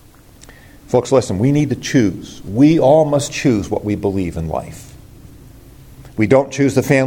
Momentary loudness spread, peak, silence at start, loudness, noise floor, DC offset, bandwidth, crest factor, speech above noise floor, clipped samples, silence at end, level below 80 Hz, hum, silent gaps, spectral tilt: 13 LU; 0 dBFS; 0.9 s; -16 LUFS; -43 dBFS; under 0.1%; 17 kHz; 16 dB; 28 dB; under 0.1%; 0 s; -44 dBFS; none; none; -6.5 dB/octave